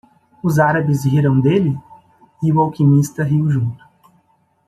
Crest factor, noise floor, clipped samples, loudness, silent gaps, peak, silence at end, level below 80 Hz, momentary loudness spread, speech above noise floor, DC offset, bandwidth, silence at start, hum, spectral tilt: 14 dB; -60 dBFS; under 0.1%; -16 LUFS; none; -2 dBFS; 0.9 s; -54 dBFS; 8 LU; 45 dB; under 0.1%; 13.5 kHz; 0.45 s; none; -8 dB/octave